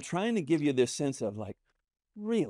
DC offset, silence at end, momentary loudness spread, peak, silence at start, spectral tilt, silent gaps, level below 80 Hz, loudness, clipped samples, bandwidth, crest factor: under 0.1%; 0 s; 14 LU; -14 dBFS; 0 s; -5.5 dB/octave; none; -72 dBFS; -30 LUFS; under 0.1%; 13 kHz; 18 dB